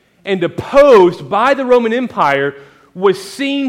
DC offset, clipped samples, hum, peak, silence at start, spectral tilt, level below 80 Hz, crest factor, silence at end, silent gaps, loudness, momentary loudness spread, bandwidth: under 0.1%; under 0.1%; none; 0 dBFS; 0.25 s; -5.5 dB/octave; -46 dBFS; 12 dB; 0 s; none; -13 LUFS; 11 LU; 15 kHz